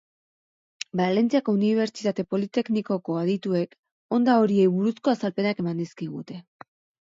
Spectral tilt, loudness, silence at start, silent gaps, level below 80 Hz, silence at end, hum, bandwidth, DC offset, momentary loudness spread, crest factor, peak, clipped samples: -7 dB/octave; -24 LUFS; 0.95 s; 3.78-3.83 s, 3.91-4.09 s; -70 dBFS; 0.6 s; none; 7.8 kHz; under 0.1%; 14 LU; 18 dB; -8 dBFS; under 0.1%